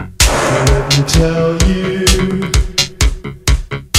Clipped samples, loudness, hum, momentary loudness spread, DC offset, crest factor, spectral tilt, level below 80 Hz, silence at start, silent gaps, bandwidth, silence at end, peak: under 0.1%; -13 LUFS; none; 5 LU; under 0.1%; 12 dB; -4 dB/octave; -18 dBFS; 0 s; none; 16 kHz; 0 s; 0 dBFS